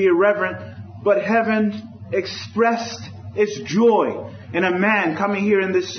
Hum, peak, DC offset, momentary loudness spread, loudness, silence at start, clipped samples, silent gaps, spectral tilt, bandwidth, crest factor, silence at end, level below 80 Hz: none; -4 dBFS; under 0.1%; 14 LU; -20 LUFS; 0 s; under 0.1%; none; -5.5 dB/octave; 6.6 kHz; 16 dB; 0 s; -64 dBFS